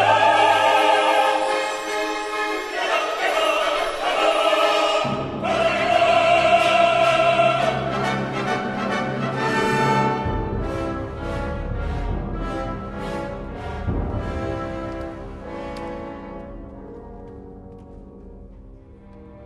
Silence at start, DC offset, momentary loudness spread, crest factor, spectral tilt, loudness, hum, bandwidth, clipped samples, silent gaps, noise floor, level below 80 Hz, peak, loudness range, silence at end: 0 s; under 0.1%; 18 LU; 16 dB; -4.5 dB/octave; -21 LUFS; none; 13 kHz; under 0.1%; none; -43 dBFS; -36 dBFS; -4 dBFS; 16 LU; 0 s